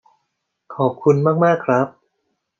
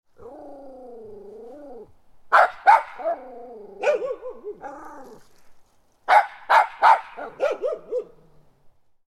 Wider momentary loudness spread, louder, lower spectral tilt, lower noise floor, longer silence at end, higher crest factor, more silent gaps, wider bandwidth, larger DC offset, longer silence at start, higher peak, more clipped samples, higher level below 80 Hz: second, 9 LU vs 25 LU; first, -18 LUFS vs -21 LUFS; first, -8.5 dB/octave vs -2.5 dB/octave; first, -74 dBFS vs -55 dBFS; second, 0.7 s vs 1.05 s; about the same, 18 dB vs 22 dB; neither; second, 7.4 kHz vs 12.5 kHz; neither; first, 0.7 s vs 0.25 s; about the same, -2 dBFS vs -2 dBFS; neither; second, -68 dBFS vs -62 dBFS